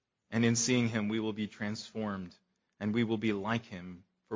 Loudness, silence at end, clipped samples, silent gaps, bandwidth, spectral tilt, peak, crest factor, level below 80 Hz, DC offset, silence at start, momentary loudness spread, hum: -33 LUFS; 0 s; under 0.1%; none; 7.6 kHz; -4.5 dB/octave; -14 dBFS; 20 dB; -66 dBFS; under 0.1%; 0.3 s; 16 LU; none